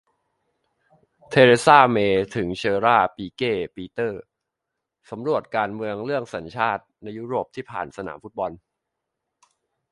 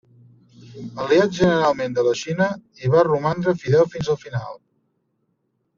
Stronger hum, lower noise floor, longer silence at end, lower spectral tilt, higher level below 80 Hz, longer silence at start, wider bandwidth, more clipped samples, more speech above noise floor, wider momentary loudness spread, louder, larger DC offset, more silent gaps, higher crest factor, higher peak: neither; first, -83 dBFS vs -71 dBFS; first, 1.35 s vs 1.2 s; about the same, -5.5 dB/octave vs -5.5 dB/octave; about the same, -58 dBFS vs -54 dBFS; first, 1.3 s vs 0.6 s; first, 11.5 kHz vs 7.4 kHz; neither; first, 61 dB vs 51 dB; first, 18 LU vs 13 LU; about the same, -21 LUFS vs -20 LUFS; neither; neither; first, 24 dB vs 18 dB; first, 0 dBFS vs -4 dBFS